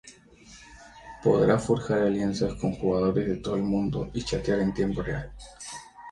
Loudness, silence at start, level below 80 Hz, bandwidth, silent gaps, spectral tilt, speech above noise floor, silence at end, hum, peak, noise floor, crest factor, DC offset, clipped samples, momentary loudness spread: -26 LUFS; 0.05 s; -46 dBFS; 11.5 kHz; none; -6.5 dB/octave; 26 dB; 0 s; none; -8 dBFS; -52 dBFS; 20 dB; under 0.1%; under 0.1%; 19 LU